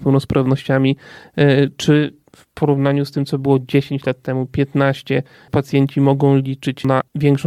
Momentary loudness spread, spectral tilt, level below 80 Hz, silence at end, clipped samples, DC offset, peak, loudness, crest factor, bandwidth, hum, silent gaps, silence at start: 7 LU; -7.5 dB/octave; -50 dBFS; 0 s; under 0.1%; under 0.1%; 0 dBFS; -17 LUFS; 16 dB; 12 kHz; none; none; 0 s